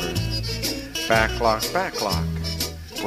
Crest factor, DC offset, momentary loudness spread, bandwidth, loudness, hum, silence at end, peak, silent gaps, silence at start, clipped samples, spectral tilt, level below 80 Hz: 20 dB; under 0.1%; 7 LU; 15.5 kHz; -23 LUFS; none; 0 s; -4 dBFS; none; 0 s; under 0.1%; -4 dB/octave; -36 dBFS